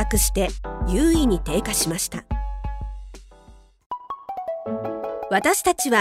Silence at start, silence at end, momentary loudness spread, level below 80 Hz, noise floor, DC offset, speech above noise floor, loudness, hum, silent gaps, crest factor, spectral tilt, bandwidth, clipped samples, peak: 0 s; 0 s; 15 LU; -30 dBFS; -49 dBFS; under 0.1%; 29 dB; -23 LUFS; none; 3.86-3.90 s; 18 dB; -4 dB/octave; 16 kHz; under 0.1%; -4 dBFS